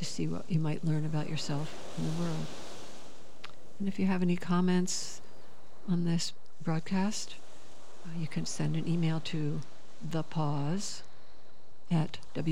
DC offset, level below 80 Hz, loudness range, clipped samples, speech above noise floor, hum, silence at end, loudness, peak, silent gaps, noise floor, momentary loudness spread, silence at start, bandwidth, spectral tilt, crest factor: 2%; -68 dBFS; 4 LU; under 0.1%; 29 dB; none; 0 s; -34 LUFS; -18 dBFS; none; -61 dBFS; 18 LU; 0 s; 12.5 kHz; -5.5 dB/octave; 16 dB